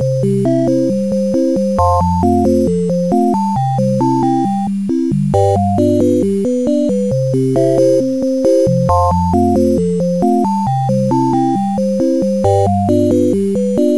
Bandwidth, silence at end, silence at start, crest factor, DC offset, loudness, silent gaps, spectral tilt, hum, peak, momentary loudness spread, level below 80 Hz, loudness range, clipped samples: 11 kHz; 0 s; 0 s; 12 dB; 1%; -14 LUFS; none; -8.5 dB/octave; none; 0 dBFS; 3 LU; -36 dBFS; 1 LU; under 0.1%